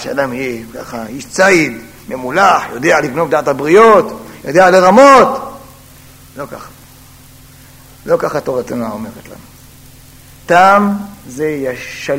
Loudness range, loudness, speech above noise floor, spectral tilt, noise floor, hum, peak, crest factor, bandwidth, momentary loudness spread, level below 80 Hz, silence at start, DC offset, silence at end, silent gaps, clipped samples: 13 LU; -11 LUFS; 28 dB; -5 dB/octave; -39 dBFS; none; 0 dBFS; 12 dB; 16.5 kHz; 21 LU; -46 dBFS; 0 s; under 0.1%; 0 s; none; 0.5%